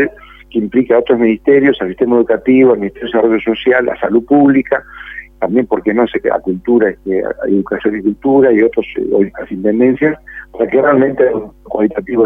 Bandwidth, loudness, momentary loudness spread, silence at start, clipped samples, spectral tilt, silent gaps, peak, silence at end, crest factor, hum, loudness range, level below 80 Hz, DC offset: 3.8 kHz; -13 LUFS; 9 LU; 0 s; under 0.1%; -9 dB/octave; none; 0 dBFS; 0 s; 12 dB; none; 3 LU; -44 dBFS; under 0.1%